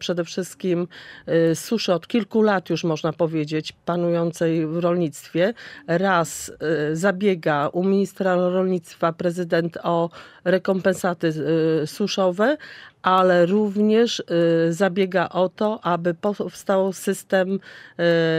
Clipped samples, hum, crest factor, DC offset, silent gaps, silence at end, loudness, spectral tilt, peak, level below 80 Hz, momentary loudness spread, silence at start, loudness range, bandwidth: under 0.1%; none; 16 dB; under 0.1%; none; 0 s; -22 LUFS; -6 dB/octave; -4 dBFS; -66 dBFS; 7 LU; 0 s; 3 LU; 16 kHz